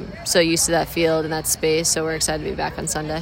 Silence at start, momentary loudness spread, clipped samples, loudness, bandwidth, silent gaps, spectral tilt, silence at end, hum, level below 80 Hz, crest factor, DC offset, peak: 0 s; 7 LU; under 0.1%; -20 LUFS; 16.5 kHz; none; -3 dB/octave; 0 s; none; -42 dBFS; 16 dB; under 0.1%; -4 dBFS